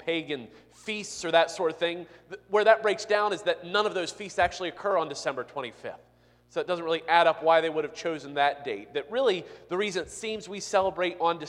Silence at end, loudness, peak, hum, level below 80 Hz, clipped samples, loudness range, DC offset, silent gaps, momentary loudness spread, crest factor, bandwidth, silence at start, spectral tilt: 0 s; -27 LUFS; -6 dBFS; 60 Hz at -65 dBFS; -64 dBFS; under 0.1%; 4 LU; under 0.1%; none; 14 LU; 22 dB; 11.5 kHz; 0 s; -3 dB/octave